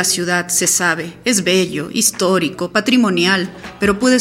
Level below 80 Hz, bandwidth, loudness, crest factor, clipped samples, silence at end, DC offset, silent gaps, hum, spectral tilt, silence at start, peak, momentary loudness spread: -48 dBFS; 16.5 kHz; -15 LUFS; 16 dB; under 0.1%; 0 s; under 0.1%; none; none; -3 dB/octave; 0 s; 0 dBFS; 5 LU